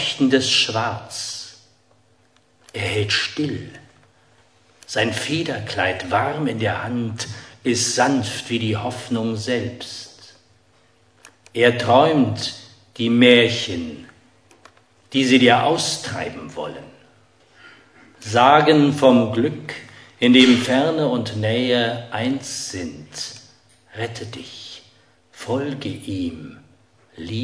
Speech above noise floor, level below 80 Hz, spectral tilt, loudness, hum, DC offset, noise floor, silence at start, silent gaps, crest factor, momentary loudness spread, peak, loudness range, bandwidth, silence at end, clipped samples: 40 dB; -60 dBFS; -4.5 dB/octave; -19 LUFS; none; under 0.1%; -59 dBFS; 0 s; none; 20 dB; 20 LU; 0 dBFS; 12 LU; 11 kHz; 0 s; under 0.1%